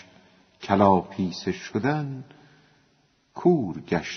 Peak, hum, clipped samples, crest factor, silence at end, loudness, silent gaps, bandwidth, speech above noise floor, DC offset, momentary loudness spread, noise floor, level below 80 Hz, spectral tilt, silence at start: -4 dBFS; none; under 0.1%; 22 dB; 0 s; -24 LUFS; none; 6.4 kHz; 41 dB; under 0.1%; 18 LU; -65 dBFS; -60 dBFS; -6 dB/octave; 0.6 s